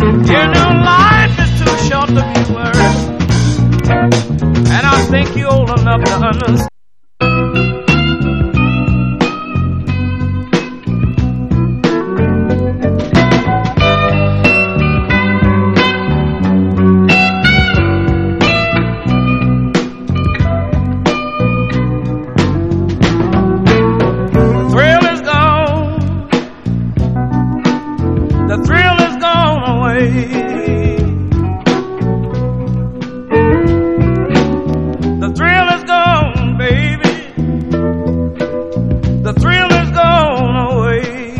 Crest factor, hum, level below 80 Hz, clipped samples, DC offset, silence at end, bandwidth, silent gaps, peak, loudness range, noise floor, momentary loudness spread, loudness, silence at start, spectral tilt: 12 dB; none; -24 dBFS; 0.1%; 1%; 0 s; 9.8 kHz; none; 0 dBFS; 4 LU; -69 dBFS; 7 LU; -12 LUFS; 0 s; -6.5 dB/octave